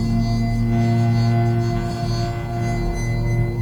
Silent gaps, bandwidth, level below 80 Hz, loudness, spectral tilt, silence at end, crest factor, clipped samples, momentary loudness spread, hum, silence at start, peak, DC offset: none; 10 kHz; -28 dBFS; -21 LUFS; -7.5 dB/octave; 0 s; 12 dB; under 0.1%; 6 LU; none; 0 s; -8 dBFS; under 0.1%